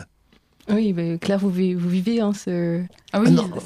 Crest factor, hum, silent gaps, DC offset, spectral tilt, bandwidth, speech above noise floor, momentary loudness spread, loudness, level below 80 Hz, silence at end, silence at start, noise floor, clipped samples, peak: 18 dB; none; none; under 0.1%; -7.5 dB/octave; 12.5 kHz; 39 dB; 8 LU; -22 LUFS; -58 dBFS; 0 s; 0 s; -59 dBFS; under 0.1%; -4 dBFS